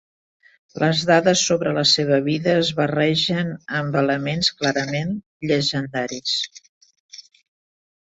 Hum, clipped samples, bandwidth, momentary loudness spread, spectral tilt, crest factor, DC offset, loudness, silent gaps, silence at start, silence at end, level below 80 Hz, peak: none; under 0.1%; 8.2 kHz; 9 LU; -4 dB/octave; 20 dB; under 0.1%; -20 LUFS; 5.26-5.40 s, 6.69-6.81 s, 7.00-7.09 s; 0.75 s; 0.95 s; -58 dBFS; -2 dBFS